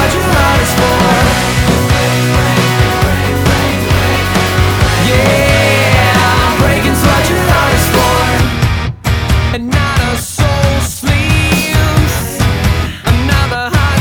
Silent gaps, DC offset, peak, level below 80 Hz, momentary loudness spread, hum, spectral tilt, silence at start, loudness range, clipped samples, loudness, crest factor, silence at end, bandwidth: none; under 0.1%; 0 dBFS; -20 dBFS; 5 LU; none; -5 dB/octave; 0 s; 3 LU; under 0.1%; -11 LUFS; 10 dB; 0 s; over 20 kHz